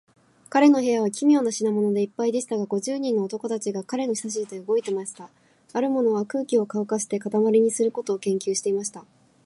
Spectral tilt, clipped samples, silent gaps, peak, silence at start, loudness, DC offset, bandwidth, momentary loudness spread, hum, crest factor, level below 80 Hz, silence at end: -5 dB/octave; under 0.1%; none; -6 dBFS; 0.5 s; -24 LUFS; under 0.1%; 11.5 kHz; 9 LU; none; 18 dB; -78 dBFS; 0.45 s